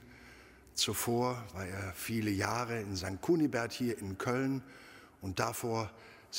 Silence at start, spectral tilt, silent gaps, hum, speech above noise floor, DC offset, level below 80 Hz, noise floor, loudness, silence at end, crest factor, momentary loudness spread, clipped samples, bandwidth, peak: 0 s; -4.5 dB/octave; none; none; 22 dB; under 0.1%; -64 dBFS; -57 dBFS; -35 LUFS; 0 s; 22 dB; 22 LU; under 0.1%; 16 kHz; -14 dBFS